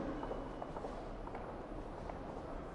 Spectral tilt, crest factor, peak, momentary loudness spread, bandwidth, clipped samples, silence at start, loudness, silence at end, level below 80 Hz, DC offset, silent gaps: -7.5 dB/octave; 16 dB; -28 dBFS; 3 LU; 11 kHz; under 0.1%; 0 s; -46 LUFS; 0 s; -52 dBFS; under 0.1%; none